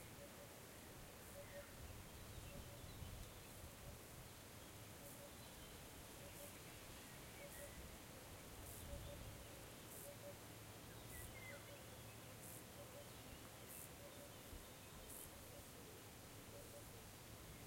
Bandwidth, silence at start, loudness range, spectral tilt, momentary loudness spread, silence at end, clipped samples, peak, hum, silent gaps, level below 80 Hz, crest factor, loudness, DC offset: 16.5 kHz; 0 s; 1 LU; -3.5 dB/octave; 3 LU; 0 s; under 0.1%; -40 dBFS; none; none; -66 dBFS; 18 dB; -57 LUFS; under 0.1%